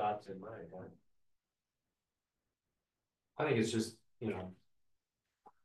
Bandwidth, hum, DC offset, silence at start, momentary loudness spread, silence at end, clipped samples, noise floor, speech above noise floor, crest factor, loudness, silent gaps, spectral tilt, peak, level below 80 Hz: 12 kHz; none; under 0.1%; 0 s; 19 LU; 0.15 s; under 0.1%; under -90 dBFS; over 51 dB; 22 dB; -39 LUFS; none; -5.5 dB/octave; -20 dBFS; -80 dBFS